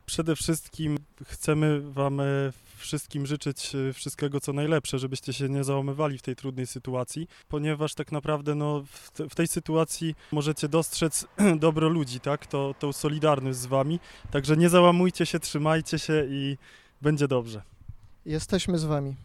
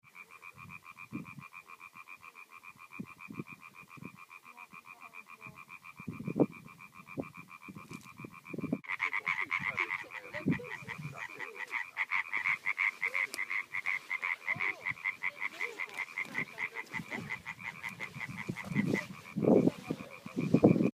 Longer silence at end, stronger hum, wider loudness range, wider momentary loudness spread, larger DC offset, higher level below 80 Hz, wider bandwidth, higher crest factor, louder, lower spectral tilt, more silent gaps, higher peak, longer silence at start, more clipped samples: about the same, 0 s vs 0.1 s; neither; second, 6 LU vs 16 LU; second, 11 LU vs 19 LU; neither; first, -52 dBFS vs -74 dBFS; about the same, 15.5 kHz vs 15.5 kHz; second, 22 dB vs 28 dB; first, -27 LUFS vs -35 LUFS; about the same, -5.5 dB/octave vs -6.5 dB/octave; neither; first, -4 dBFS vs -10 dBFS; about the same, 0.1 s vs 0.15 s; neither